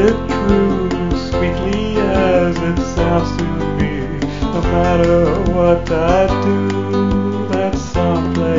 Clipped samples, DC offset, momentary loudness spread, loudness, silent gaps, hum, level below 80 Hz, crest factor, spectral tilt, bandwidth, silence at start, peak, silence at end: under 0.1%; 2%; 6 LU; -16 LUFS; none; none; -26 dBFS; 14 dB; -7 dB/octave; 7.6 kHz; 0 s; 0 dBFS; 0 s